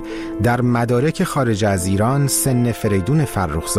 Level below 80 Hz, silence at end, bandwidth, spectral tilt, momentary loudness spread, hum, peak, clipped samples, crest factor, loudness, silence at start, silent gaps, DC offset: -38 dBFS; 0 s; 16 kHz; -5.5 dB/octave; 4 LU; none; -6 dBFS; under 0.1%; 12 dB; -18 LUFS; 0 s; none; under 0.1%